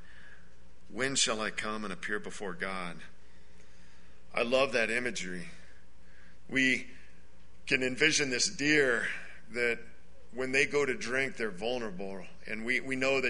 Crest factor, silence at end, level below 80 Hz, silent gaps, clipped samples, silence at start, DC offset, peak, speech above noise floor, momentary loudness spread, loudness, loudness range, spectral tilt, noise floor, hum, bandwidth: 24 dB; 0 s; -60 dBFS; none; under 0.1%; 0.1 s; 1%; -10 dBFS; 27 dB; 16 LU; -31 LUFS; 5 LU; -2.5 dB/octave; -59 dBFS; none; 10.5 kHz